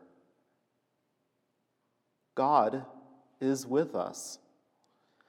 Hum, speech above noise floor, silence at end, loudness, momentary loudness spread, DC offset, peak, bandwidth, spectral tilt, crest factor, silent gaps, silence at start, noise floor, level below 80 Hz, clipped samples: none; 49 dB; 0.95 s; -31 LUFS; 18 LU; under 0.1%; -10 dBFS; 16.5 kHz; -5 dB/octave; 24 dB; none; 2.35 s; -79 dBFS; under -90 dBFS; under 0.1%